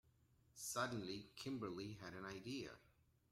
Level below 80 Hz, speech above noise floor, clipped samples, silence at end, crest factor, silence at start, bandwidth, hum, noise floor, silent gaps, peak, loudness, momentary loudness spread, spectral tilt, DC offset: -76 dBFS; 27 dB; under 0.1%; 0.4 s; 22 dB; 0.55 s; 16 kHz; none; -76 dBFS; none; -28 dBFS; -49 LUFS; 10 LU; -4 dB/octave; under 0.1%